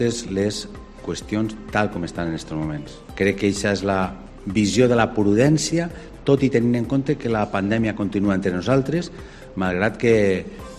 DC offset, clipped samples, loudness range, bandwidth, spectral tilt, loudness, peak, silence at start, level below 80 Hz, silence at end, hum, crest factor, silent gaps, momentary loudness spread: under 0.1%; under 0.1%; 5 LU; 13 kHz; -6 dB/octave; -21 LUFS; -2 dBFS; 0 s; -44 dBFS; 0 s; none; 18 dB; none; 13 LU